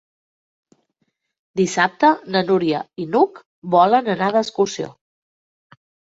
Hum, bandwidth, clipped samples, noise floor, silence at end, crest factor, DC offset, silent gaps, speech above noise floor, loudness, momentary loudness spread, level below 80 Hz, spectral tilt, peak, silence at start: none; 8 kHz; under 0.1%; -71 dBFS; 1.2 s; 18 dB; under 0.1%; 3.46-3.62 s; 54 dB; -18 LUFS; 11 LU; -66 dBFS; -5 dB/octave; -2 dBFS; 1.55 s